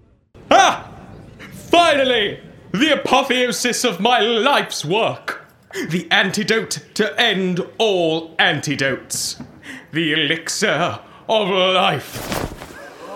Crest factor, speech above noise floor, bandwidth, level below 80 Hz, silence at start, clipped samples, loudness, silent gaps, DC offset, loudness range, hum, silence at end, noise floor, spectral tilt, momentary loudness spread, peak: 18 dB; 28 dB; 17.5 kHz; -50 dBFS; 0.35 s; under 0.1%; -17 LUFS; none; under 0.1%; 3 LU; none; 0 s; -46 dBFS; -3 dB/octave; 17 LU; 0 dBFS